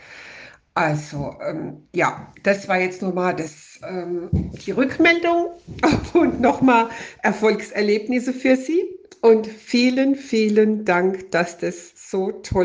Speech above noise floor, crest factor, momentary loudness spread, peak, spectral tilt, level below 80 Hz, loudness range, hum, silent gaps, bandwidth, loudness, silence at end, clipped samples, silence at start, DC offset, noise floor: 23 dB; 18 dB; 12 LU; -4 dBFS; -6 dB/octave; -46 dBFS; 5 LU; none; none; 9.8 kHz; -20 LUFS; 0 s; under 0.1%; 0.1 s; under 0.1%; -43 dBFS